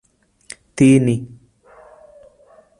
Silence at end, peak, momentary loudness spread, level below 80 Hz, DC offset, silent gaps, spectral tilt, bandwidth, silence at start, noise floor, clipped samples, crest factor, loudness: 1.55 s; -2 dBFS; 26 LU; -54 dBFS; under 0.1%; none; -7 dB/octave; 11 kHz; 0.75 s; -51 dBFS; under 0.1%; 18 dB; -15 LUFS